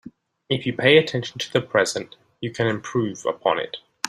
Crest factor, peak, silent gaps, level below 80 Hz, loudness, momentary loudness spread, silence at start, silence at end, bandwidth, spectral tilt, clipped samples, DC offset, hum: 20 dB; -2 dBFS; none; -62 dBFS; -22 LUFS; 16 LU; 0.05 s; 0 s; 14 kHz; -4.5 dB/octave; under 0.1%; under 0.1%; none